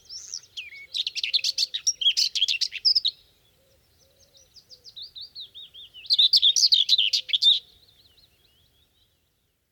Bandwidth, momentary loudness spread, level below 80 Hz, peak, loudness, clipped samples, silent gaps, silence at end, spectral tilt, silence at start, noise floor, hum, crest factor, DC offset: 19 kHz; 23 LU; -72 dBFS; -8 dBFS; -20 LUFS; under 0.1%; none; 2.1 s; 4.5 dB/octave; 0.1 s; -71 dBFS; none; 20 dB; under 0.1%